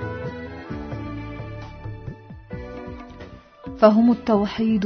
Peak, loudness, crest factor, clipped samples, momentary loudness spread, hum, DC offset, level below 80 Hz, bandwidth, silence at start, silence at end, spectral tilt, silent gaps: -2 dBFS; -21 LUFS; 22 dB; under 0.1%; 23 LU; none; under 0.1%; -44 dBFS; 6.4 kHz; 0 s; 0 s; -8.5 dB/octave; none